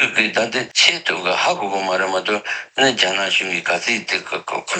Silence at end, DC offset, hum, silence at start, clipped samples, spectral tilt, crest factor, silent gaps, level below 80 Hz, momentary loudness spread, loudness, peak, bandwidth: 0 s; under 0.1%; none; 0 s; under 0.1%; -1.5 dB/octave; 20 dB; none; -70 dBFS; 8 LU; -18 LUFS; 0 dBFS; 9.4 kHz